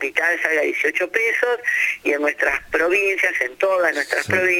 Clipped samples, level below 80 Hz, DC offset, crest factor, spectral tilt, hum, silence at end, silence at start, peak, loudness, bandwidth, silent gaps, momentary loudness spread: under 0.1%; -56 dBFS; under 0.1%; 18 dB; -3.5 dB/octave; none; 0 s; 0 s; -2 dBFS; -19 LUFS; 17 kHz; none; 3 LU